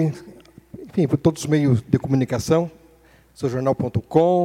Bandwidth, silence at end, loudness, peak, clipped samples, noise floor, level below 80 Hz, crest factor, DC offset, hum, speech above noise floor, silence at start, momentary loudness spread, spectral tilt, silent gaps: 15.5 kHz; 0 s; -21 LUFS; -2 dBFS; under 0.1%; -53 dBFS; -50 dBFS; 20 dB; under 0.1%; none; 33 dB; 0 s; 10 LU; -7.5 dB/octave; none